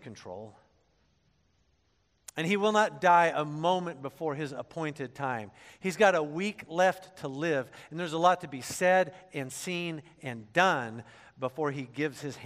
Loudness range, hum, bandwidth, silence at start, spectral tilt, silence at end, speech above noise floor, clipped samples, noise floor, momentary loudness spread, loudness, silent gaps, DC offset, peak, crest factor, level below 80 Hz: 3 LU; none; 14.5 kHz; 0.05 s; -4.5 dB/octave; 0 s; 42 dB; under 0.1%; -72 dBFS; 16 LU; -29 LUFS; none; under 0.1%; -8 dBFS; 22 dB; -74 dBFS